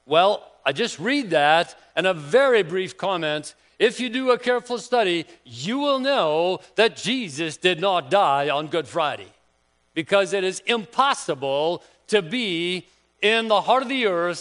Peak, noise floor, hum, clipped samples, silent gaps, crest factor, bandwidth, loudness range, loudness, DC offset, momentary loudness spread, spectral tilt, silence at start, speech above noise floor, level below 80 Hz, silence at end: -4 dBFS; -65 dBFS; none; under 0.1%; none; 18 dB; 10.5 kHz; 2 LU; -22 LUFS; under 0.1%; 8 LU; -4 dB/octave; 0.1 s; 43 dB; -72 dBFS; 0 s